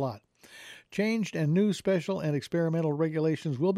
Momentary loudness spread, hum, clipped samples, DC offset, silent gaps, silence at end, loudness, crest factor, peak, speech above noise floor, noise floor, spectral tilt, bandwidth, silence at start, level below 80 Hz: 18 LU; none; under 0.1%; under 0.1%; none; 0 s; -29 LUFS; 12 dB; -16 dBFS; 22 dB; -50 dBFS; -7 dB/octave; 13 kHz; 0 s; -70 dBFS